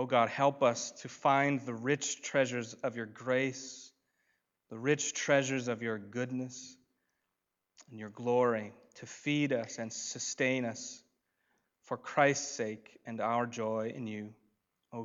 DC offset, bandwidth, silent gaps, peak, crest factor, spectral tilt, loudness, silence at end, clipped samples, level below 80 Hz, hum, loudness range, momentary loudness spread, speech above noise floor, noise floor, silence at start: under 0.1%; 8 kHz; none; -12 dBFS; 22 dB; -4 dB/octave; -33 LUFS; 0 s; under 0.1%; -86 dBFS; none; 4 LU; 19 LU; 53 dB; -86 dBFS; 0 s